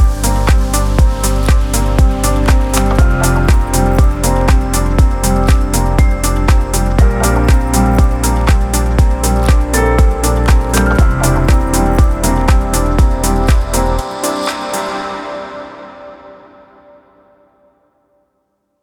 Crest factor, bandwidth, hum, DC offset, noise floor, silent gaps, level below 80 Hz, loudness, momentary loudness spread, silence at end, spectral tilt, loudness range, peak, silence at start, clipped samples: 12 dB; 18 kHz; none; under 0.1%; -65 dBFS; none; -14 dBFS; -13 LUFS; 6 LU; 2.5 s; -5.5 dB/octave; 8 LU; 0 dBFS; 0 s; under 0.1%